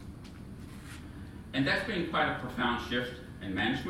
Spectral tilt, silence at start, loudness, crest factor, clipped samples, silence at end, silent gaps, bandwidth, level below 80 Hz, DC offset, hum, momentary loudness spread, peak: -5.5 dB/octave; 0 s; -32 LUFS; 20 dB; under 0.1%; 0 s; none; 16 kHz; -52 dBFS; under 0.1%; none; 17 LU; -14 dBFS